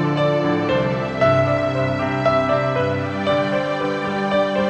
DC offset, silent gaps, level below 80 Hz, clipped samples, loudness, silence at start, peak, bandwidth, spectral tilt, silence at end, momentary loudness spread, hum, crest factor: under 0.1%; none; -48 dBFS; under 0.1%; -19 LUFS; 0 s; -4 dBFS; 9 kHz; -7 dB/octave; 0 s; 5 LU; none; 14 dB